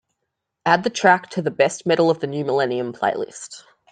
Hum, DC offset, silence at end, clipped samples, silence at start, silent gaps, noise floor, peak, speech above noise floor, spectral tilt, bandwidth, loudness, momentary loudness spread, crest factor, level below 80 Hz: none; under 0.1%; 0.3 s; under 0.1%; 0.65 s; none; -79 dBFS; -2 dBFS; 59 dB; -4.5 dB/octave; 9.6 kHz; -20 LUFS; 12 LU; 20 dB; -66 dBFS